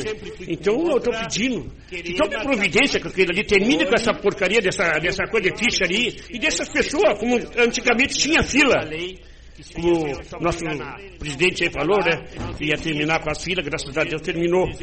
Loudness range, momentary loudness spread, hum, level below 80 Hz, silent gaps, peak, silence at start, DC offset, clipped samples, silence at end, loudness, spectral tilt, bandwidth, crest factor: 4 LU; 12 LU; none; -42 dBFS; none; -4 dBFS; 0 s; 0.1%; under 0.1%; 0 s; -20 LUFS; -3.5 dB/octave; 8.8 kHz; 16 dB